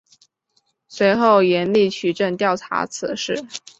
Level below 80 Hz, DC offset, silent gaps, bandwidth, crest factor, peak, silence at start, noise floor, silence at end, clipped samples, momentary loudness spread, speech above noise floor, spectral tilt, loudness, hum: -62 dBFS; under 0.1%; none; 8.2 kHz; 18 dB; -2 dBFS; 0.9 s; -67 dBFS; 0.2 s; under 0.1%; 11 LU; 49 dB; -4.5 dB/octave; -19 LUFS; none